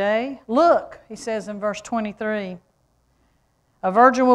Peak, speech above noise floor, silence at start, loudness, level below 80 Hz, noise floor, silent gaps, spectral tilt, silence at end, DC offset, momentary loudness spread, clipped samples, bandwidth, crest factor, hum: -2 dBFS; 45 dB; 0 s; -21 LUFS; -60 dBFS; -64 dBFS; none; -5.5 dB/octave; 0 s; under 0.1%; 18 LU; under 0.1%; 11 kHz; 18 dB; none